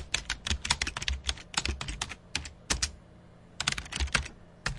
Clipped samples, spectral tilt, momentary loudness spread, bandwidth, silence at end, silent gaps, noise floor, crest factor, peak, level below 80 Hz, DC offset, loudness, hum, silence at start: under 0.1%; -1.5 dB/octave; 7 LU; 11.5 kHz; 0 s; none; -54 dBFS; 26 dB; -8 dBFS; -42 dBFS; under 0.1%; -32 LUFS; none; 0 s